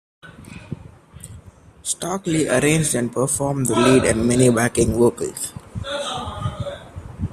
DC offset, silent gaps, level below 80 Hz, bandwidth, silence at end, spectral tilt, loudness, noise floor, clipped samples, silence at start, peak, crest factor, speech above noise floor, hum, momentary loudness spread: under 0.1%; none; -42 dBFS; 15 kHz; 0 s; -4.5 dB/octave; -19 LUFS; -44 dBFS; under 0.1%; 0.25 s; -2 dBFS; 20 dB; 26 dB; none; 21 LU